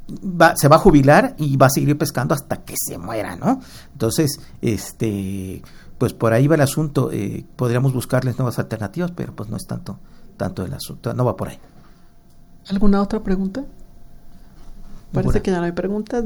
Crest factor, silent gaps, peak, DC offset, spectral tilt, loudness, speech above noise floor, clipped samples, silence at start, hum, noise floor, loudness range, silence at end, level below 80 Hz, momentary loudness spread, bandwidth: 20 dB; none; 0 dBFS; under 0.1%; -6 dB/octave; -19 LUFS; 26 dB; under 0.1%; 0 s; none; -45 dBFS; 10 LU; 0 s; -34 dBFS; 15 LU; over 20 kHz